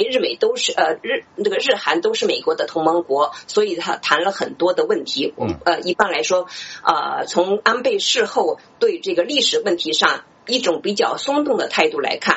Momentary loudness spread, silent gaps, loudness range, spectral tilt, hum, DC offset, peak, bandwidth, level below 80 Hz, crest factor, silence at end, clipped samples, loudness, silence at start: 5 LU; none; 1 LU; -2.5 dB/octave; none; under 0.1%; 0 dBFS; 8.2 kHz; -60 dBFS; 20 dB; 0 s; under 0.1%; -19 LUFS; 0 s